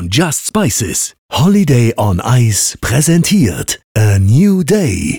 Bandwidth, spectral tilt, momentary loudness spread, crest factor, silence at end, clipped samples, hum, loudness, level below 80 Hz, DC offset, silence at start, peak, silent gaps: 19.5 kHz; -5 dB/octave; 5 LU; 8 dB; 0 s; under 0.1%; none; -12 LUFS; -36 dBFS; under 0.1%; 0 s; -2 dBFS; 1.18-1.29 s, 3.84-3.95 s